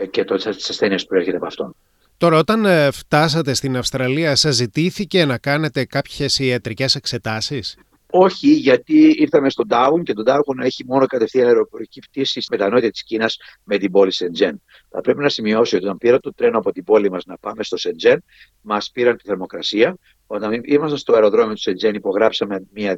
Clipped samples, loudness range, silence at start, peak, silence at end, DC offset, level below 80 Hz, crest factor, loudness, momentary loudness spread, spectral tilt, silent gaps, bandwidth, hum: under 0.1%; 4 LU; 0 s; -2 dBFS; 0 s; under 0.1%; -54 dBFS; 16 dB; -17 LUFS; 10 LU; -5 dB/octave; none; 14 kHz; none